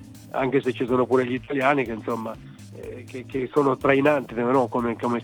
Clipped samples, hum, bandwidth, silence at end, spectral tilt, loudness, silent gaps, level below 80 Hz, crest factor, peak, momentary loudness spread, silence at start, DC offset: under 0.1%; none; 19 kHz; 0 s; -7 dB/octave; -23 LUFS; none; -56 dBFS; 18 dB; -6 dBFS; 17 LU; 0 s; under 0.1%